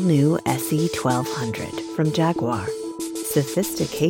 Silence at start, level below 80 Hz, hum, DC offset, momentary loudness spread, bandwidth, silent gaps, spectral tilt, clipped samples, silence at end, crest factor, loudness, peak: 0 s; -56 dBFS; none; under 0.1%; 9 LU; 17 kHz; none; -5.5 dB/octave; under 0.1%; 0 s; 16 dB; -23 LUFS; -6 dBFS